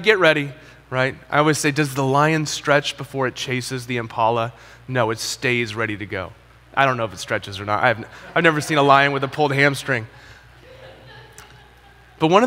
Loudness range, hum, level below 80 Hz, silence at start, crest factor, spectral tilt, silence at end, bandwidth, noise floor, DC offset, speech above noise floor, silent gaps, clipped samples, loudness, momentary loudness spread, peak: 4 LU; none; -54 dBFS; 0 s; 20 dB; -4.5 dB/octave; 0 s; 16 kHz; -48 dBFS; under 0.1%; 28 dB; none; under 0.1%; -20 LUFS; 11 LU; 0 dBFS